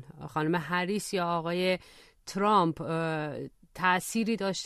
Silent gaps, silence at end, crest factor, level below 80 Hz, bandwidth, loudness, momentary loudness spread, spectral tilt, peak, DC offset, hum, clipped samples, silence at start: none; 0 s; 18 dB; -64 dBFS; 13.5 kHz; -29 LUFS; 12 LU; -5 dB/octave; -12 dBFS; under 0.1%; none; under 0.1%; 0 s